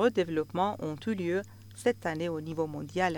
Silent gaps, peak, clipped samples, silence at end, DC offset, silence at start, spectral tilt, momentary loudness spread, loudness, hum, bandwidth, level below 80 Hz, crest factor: none; -12 dBFS; under 0.1%; 0 s; under 0.1%; 0 s; -6 dB/octave; 5 LU; -32 LUFS; none; 19 kHz; -64 dBFS; 18 dB